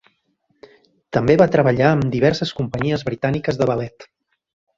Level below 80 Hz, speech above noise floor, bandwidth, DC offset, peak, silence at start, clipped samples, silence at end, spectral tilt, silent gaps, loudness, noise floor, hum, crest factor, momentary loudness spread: -48 dBFS; 49 dB; 7.6 kHz; under 0.1%; -2 dBFS; 1.1 s; under 0.1%; 0.75 s; -7.5 dB/octave; none; -18 LUFS; -67 dBFS; none; 18 dB; 9 LU